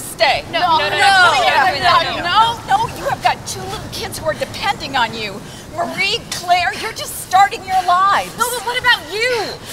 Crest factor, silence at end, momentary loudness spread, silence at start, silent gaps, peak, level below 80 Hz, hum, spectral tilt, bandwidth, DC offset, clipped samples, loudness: 16 dB; 0 s; 12 LU; 0 s; none; -2 dBFS; -44 dBFS; none; -2 dB/octave; 16 kHz; under 0.1%; under 0.1%; -15 LUFS